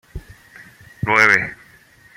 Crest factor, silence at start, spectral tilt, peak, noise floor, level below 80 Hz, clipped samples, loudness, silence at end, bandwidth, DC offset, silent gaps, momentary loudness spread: 20 dB; 0.15 s; -4 dB/octave; 0 dBFS; -49 dBFS; -44 dBFS; under 0.1%; -15 LUFS; 0.6 s; 16.5 kHz; under 0.1%; none; 26 LU